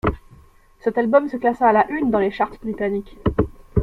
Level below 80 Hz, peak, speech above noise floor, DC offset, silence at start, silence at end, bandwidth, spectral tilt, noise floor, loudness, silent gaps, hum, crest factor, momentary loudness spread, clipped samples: -38 dBFS; -4 dBFS; 30 dB; under 0.1%; 0.05 s; 0 s; 10 kHz; -9 dB/octave; -50 dBFS; -20 LUFS; none; none; 18 dB; 9 LU; under 0.1%